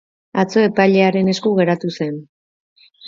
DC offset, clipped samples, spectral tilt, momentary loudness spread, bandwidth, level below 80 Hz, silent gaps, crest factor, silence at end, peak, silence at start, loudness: under 0.1%; under 0.1%; -6.5 dB/octave; 12 LU; 7.4 kHz; -62 dBFS; 2.29-2.76 s; 18 dB; 0 s; 0 dBFS; 0.35 s; -16 LUFS